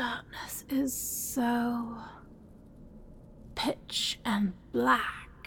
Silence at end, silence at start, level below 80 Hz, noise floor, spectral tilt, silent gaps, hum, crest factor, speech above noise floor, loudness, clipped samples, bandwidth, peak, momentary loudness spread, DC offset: 0 s; 0 s; -56 dBFS; -52 dBFS; -3 dB/octave; none; none; 22 dB; 21 dB; -31 LUFS; under 0.1%; 17.5 kHz; -12 dBFS; 14 LU; under 0.1%